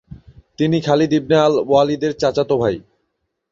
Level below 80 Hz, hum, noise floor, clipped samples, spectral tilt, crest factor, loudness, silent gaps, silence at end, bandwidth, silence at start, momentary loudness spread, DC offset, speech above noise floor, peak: -50 dBFS; none; -73 dBFS; under 0.1%; -6.5 dB/octave; 16 dB; -17 LUFS; none; 0.7 s; 7.6 kHz; 0.1 s; 6 LU; under 0.1%; 57 dB; -2 dBFS